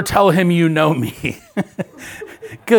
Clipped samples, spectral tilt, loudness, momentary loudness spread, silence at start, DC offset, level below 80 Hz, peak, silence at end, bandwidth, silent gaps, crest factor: under 0.1%; -6 dB/octave; -17 LUFS; 19 LU; 0 s; under 0.1%; -46 dBFS; 0 dBFS; 0 s; 19 kHz; none; 16 dB